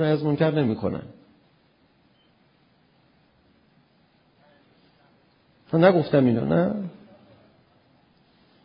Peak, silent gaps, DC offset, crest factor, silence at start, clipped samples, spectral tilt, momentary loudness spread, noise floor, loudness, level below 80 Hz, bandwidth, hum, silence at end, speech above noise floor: -4 dBFS; none; under 0.1%; 22 dB; 0 s; under 0.1%; -12 dB/octave; 16 LU; -62 dBFS; -22 LUFS; -60 dBFS; 5.4 kHz; none; 1.75 s; 41 dB